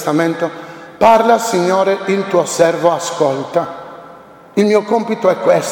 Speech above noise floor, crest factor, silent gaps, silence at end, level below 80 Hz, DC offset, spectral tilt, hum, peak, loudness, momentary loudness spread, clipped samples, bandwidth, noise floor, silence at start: 25 dB; 14 dB; none; 0 s; -58 dBFS; under 0.1%; -5 dB/octave; none; 0 dBFS; -14 LUFS; 12 LU; under 0.1%; 17.5 kHz; -39 dBFS; 0 s